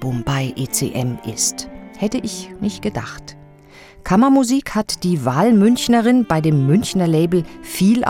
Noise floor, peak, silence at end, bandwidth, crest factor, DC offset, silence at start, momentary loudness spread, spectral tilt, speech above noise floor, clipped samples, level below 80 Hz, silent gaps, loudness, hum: -43 dBFS; -2 dBFS; 0 s; 17.5 kHz; 16 dB; under 0.1%; 0 s; 14 LU; -5.5 dB/octave; 27 dB; under 0.1%; -44 dBFS; none; -17 LUFS; none